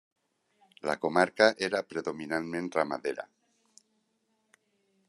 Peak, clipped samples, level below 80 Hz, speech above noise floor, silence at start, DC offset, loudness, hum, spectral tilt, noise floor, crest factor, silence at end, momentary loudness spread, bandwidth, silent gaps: -6 dBFS; under 0.1%; -74 dBFS; 47 dB; 0.85 s; under 0.1%; -29 LUFS; none; -4.5 dB/octave; -76 dBFS; 26 dB; 1.85 s; 13 LU; 12 kHz; none